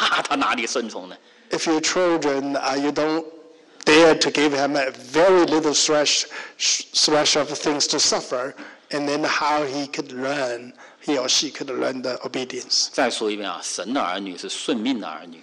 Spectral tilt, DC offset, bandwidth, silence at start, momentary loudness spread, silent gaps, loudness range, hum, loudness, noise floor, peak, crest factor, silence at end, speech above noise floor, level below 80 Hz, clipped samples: -2 dB/octave; under 0.1%; 11.5 kHz; 0 s; 12 LU; none; 6 LU; none; -21 LUFS; -45 dBFS; -6 dBFS; 16 dB; 0 s; 23 dB; -62 dBFS; under 0.1%